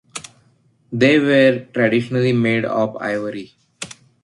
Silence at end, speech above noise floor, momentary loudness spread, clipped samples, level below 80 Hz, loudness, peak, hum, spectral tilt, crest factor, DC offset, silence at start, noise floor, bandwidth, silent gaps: 0.35 s; 41 dB; 20 LU; under 0.1%; -60 dBFS; -17 LUFS; -2 dBFS; none; -6 dB/octave; 16 dB; under 0.1%; 0.15 s; -58 dBFS; 11.5 kHz; none